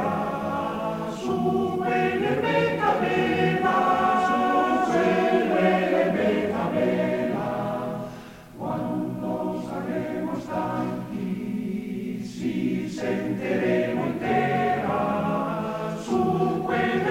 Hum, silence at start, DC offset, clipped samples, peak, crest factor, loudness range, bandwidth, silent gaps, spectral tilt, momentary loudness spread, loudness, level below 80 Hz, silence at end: none; 0 s; under 0.1%; under 0.1%; -8 dBFS; 16 dB; 8 LU; 16 kHz; none; -7 dB/octave; 9 LU; -25 LUFS; -56 dBFS; 0 s